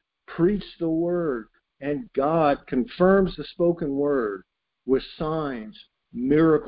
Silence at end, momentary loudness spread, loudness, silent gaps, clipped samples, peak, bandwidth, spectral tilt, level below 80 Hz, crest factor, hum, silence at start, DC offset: 0 s; 15 LU; -24 LUFS; none; under 0.1%; -6 dBFS; 5.2 kHz; -11.5 dB/octave; -50 dBFS; 18 dB; none; 0.3 s; under 0.1%